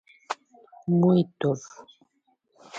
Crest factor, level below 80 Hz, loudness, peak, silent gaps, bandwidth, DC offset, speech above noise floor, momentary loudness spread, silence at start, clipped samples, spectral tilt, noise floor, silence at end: 18 dB; -70 dBFS; -25 LUFS; -10 dBFS; none; 7.8 kHz; under 0.1%; 47 dB; 17 LU; 0.3 s; under 0.1%; -8 dB/octave; -71 dBFS; 0 s